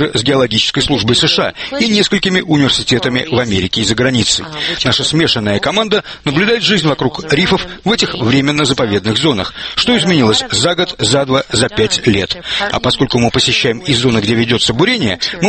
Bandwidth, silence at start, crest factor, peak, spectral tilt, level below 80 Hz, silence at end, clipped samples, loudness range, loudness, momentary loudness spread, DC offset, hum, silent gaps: 8.8 kHz; 0 s; 14 dB; 0 dBFS; -4 dB/octave; -38 dBFS; 0 s; under 0.1%; 1 LU; -12 LUFS; 5 LU; under 0.1%; none; none